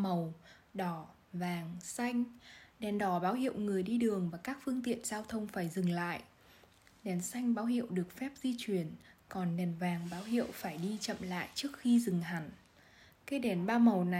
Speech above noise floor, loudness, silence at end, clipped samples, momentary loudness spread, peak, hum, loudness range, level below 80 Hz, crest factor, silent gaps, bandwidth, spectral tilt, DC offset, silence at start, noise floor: 28 dB; -36 LUFS; 0 s; under 0.1%; 13 LU; -16 dBFS; none; 3 LU; -70 dBFS; 20 dB; none; 16 kHz; -6 dB/octave; under 0.1%; 0 s; -63 dBFS